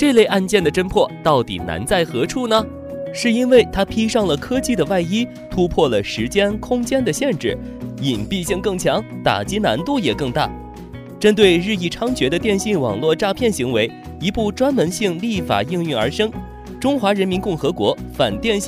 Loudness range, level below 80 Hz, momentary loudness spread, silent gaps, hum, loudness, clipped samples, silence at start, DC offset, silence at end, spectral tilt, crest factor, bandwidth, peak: 3 LU; -40 dBFS; 9 LU; none; none; -18 LUFS; under 0.1%; 0 s; under 0.1%; 0 s; -5 dB/octave; 16 dB; 16 kHz; -2 dBFS